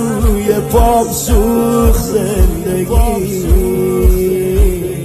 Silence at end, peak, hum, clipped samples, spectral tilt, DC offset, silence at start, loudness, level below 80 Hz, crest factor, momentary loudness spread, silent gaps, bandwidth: 0 s; 0 dBFS; none; under 0.1%; -6.5 dB/octave; under 0.1%; 0 s; -13 LUFS; -14 dBFS; 12 dB; 3 LU; none; 14.5 kHz